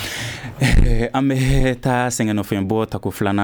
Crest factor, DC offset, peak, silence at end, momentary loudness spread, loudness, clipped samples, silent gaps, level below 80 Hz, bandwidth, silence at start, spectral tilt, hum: 16 dB; under 0.1%; -2 dBFS; 0 s; 7 LU; -20 LUFS; under 0.1%; none; -22 dBFS; over 20 kHz; 0 s; -5.5 dB/octave; none